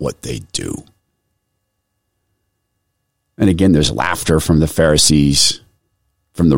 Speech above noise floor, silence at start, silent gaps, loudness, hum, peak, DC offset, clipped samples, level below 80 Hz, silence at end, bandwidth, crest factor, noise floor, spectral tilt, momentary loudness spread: 57 dB; 0 s; none; -14 LUFS; none; -2 dBFS; under 0.1%; under 0.1%; -32 dBFS; 0 s; 16.5 kHz; 16 dB; -71 dBFS; -4.5 dB/octave; 17 LU